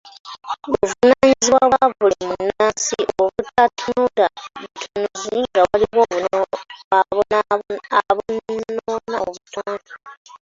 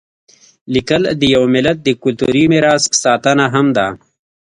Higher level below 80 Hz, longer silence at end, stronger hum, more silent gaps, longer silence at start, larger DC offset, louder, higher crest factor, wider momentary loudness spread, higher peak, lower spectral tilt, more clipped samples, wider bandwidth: second, -52 dBFS vs -46 dBFS; second, 0.1 s vs 0.55 s; neither; first, 0.20-0.24 s, 6.84-6.91 s, 10.17-10.25 s vs none; second, 0.05 s vs 0.7 s; neither; second, -18 LUFS vs -13 LUFS; about the same, 18 dB vs 14 dB; first, 15 LU vs 6 LU; about the same, -2 dBFS vs 0 dBFS; about the same, -3 dB/octave vs -4 dB/octave; neither; second, 8 kHz vs 11 kHz